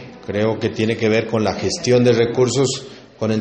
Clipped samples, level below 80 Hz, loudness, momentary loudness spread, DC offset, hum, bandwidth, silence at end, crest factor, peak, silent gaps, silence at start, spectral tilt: under 0.1%; -52 dBFS; -18 LUFS; 11 LU; under 0.1%; none; 8.8 kHz; 0 s; 16 dB; -2 dBFS; none; 0 s; -5 dB/octave